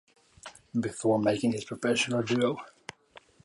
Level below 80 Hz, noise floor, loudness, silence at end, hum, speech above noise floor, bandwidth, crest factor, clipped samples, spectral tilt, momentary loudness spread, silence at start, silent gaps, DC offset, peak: -68 dBFS; -57 dBFS; -29 LUFS; 0.25 s; none; 29 dB; 11.5 kHz; 18 dB; under 0.1%; -5 dB/octave; 21 LU; 0.45 s; none; under 0.1%; -14 dBFS